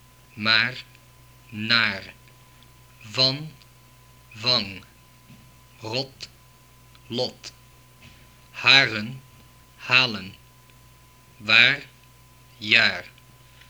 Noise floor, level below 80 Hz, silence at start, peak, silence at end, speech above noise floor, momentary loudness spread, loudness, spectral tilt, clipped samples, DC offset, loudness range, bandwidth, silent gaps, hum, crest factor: -53 dBFS; -60 dBFS; 0.35 s; 0 dBFS; 0.6 s; 30 dB; 26 LU; -20 LUFS; -3 dB/octave; under 0.1%; under 0.1%; 10 LU; over 20 kHz; none; none; 26 dB